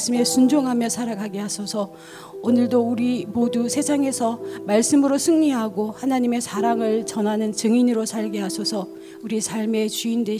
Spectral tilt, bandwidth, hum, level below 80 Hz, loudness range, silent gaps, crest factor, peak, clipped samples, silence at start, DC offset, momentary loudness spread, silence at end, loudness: -4 dB/octave; 16 kHz; none; -64 dBFS; 3 LU; none; 16 dB; -6 dBFS; under 0.1%; 0 s; under 0.1%; 10 LU; 0 s; -21 LUFS